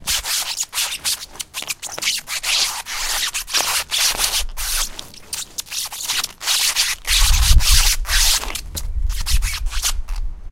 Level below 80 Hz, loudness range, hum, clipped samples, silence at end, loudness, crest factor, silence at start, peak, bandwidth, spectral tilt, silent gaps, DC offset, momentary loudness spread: -22 dBFS; 4 LU; none; under 0.1%; 0 s; -19 LUFS; 20 dB; 0 s; 0 dBFS; 17 kHz; 0 dB/octave; none; under 0.1%; 12 LU